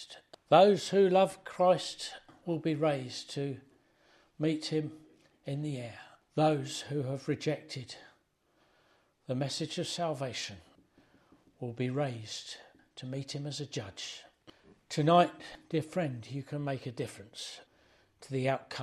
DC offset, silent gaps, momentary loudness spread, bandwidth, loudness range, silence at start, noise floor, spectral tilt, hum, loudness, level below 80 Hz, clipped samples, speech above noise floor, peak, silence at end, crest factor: under 0.1%; none; 20 LU; 13.5 kHz; 8 LU; 0 s; -72 dBFS; -5.5 dB/octave; none; -32 LUFS; -74 dBFS; under 0.1%; 40 dB; -10 dBFS; 0 s; 24 dB